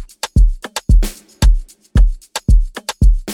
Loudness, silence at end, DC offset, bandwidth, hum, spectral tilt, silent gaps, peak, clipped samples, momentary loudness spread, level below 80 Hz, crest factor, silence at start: -18 LUFS; 0 s; under 0.1%; 13 kHz; none; -5 dB/octave; none; -2 dBFS; under 0.1%; 7 LU; -14 dBFS; 10 dB; 0 s